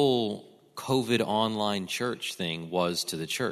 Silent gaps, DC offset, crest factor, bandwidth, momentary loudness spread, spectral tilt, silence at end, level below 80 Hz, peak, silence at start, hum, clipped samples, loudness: none; under 0.1%; 18 dB; 14 kHz; 8 LU; -4.5 dB/octave; 0 s; -70 dBFS; -10 dBFS; 0 s; none; under 0.1%; -29 LUFS